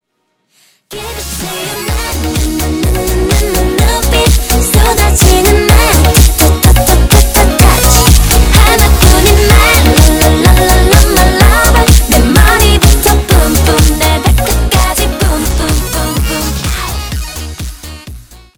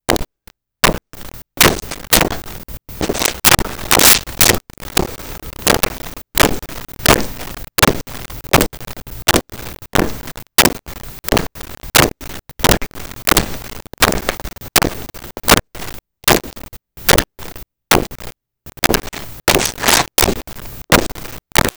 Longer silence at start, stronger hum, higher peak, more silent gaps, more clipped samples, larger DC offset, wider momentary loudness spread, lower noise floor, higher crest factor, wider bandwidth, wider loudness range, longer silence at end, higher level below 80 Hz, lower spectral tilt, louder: first, 0.9 s vs 0.1 s; neither; about the same, 0 dBFS vs 0 dBFS; neither; first, 2% vs under 0.1%; neither; second, 11 LU vs 19 LU; first, -63 dBFS vs -49 dBFS; second, 8 dB vs 18 dB; about the same, over 20 kHz vs over 20 kHz; first, 8 LU vs 4 LU; first, 0.35 s vs 0.05 s; first, -10 dBFS vs -30 dBFS; first, -4 dB/octave vs -2.5 dB/octave; first, -8 LUFS vs -14 LUFS